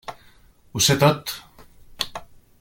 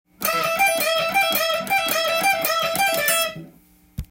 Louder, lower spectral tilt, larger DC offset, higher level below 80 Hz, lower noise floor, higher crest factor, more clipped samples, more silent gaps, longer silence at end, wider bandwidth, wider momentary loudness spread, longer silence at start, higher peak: about the same, -21 LUFS vs -19 LUFS; first, -3.5 dB/octave vs -1 dB/octave; neither; about the same, -52 dBFS vs -48 dBFS; about the same, -52 dBFS vs -52 dBFS; about the same, 22 dB vs 18 dB; neither; neither; first, 0.35 s vs 0.05 s; about the same, 17 kHz vs 17 kHz; first, 22 LU vs 7 LU; about the same, 0.1 s vs 0.2 s; about the same, -4 dBFS vs -4 dBFS